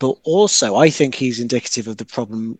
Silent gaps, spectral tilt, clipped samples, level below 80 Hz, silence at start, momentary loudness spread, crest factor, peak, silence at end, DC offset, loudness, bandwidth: none; -4 dB/octave; under 0.1%; -64 dBFS; 0 s; 12 LU; 18 dB; 0 dBFS; 0.05 s; under 0.1%; -17 LUFS; 9.6 kHz